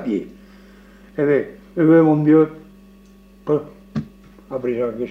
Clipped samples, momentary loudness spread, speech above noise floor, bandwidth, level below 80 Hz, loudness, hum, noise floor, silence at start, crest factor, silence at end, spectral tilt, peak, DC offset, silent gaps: under 0.1%; 19 LU; 30 dB; 4.6 kHz; -52 dBFS; -19 LUFS; none; -47 dBFS; 0 s; 16 dB; 0 s; -10 dB/octave; -4 dBFS; under 0.1%; none